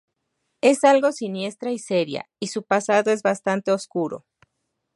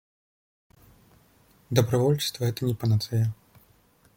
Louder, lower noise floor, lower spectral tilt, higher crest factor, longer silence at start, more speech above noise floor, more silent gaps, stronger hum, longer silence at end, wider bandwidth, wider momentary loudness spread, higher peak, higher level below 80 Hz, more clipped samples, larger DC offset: first, -22 LUFS vs -26 LUFS; first, -77 dBFS vs -61 dBFS; second, -4.5 dB/octave vs -6 dB/octave; second, 18 dB vs 24 dB; second, 0.65 s vs 1.7 s; first, 56 dB vs 37 dB; neither; neither; about the same, 0.8 s vs 0.85 s; second, 11.5 kHz vs 17 kHz; first, 13 LU vs 5 LU; about the same, -4 dBFS vs -6 dBFS; second, -74 dBFS vs -60 dBFS; neither; neither